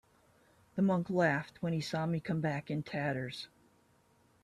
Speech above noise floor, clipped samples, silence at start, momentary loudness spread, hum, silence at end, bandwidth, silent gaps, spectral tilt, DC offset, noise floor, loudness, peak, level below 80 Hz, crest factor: 35 dB; under 0.1%; 0.75 s; 12 LU; none; 0.95 s; 12.5 kHz; none; -7 dB/octave; under 0.1%; -69 dBFS; -34 LUFS; -16 dBFS; -70 dBFS; 20 dB